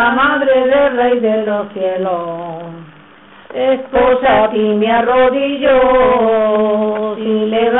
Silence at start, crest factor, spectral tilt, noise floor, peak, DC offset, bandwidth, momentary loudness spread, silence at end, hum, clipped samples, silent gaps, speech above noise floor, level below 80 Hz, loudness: 0 s; 10 dB; -10 dB/octave; -41 dBFS; -2 dBFS; under 0.1%; 4 kHz; 9 LU; 0 s; none; under 0.1%; none; 28 dB; -42 dBFS; -13 LUFS